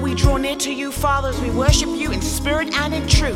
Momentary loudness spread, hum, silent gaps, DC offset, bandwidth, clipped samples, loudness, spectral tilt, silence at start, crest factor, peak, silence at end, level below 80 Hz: 5 LU; none; none; under 0.1%; 16.5 kHz; under 0.1%; -19 LUFS; -4.5 dB/octave; 0 s; 18 dB; 0 dBFS; 0 s; -24 dBFS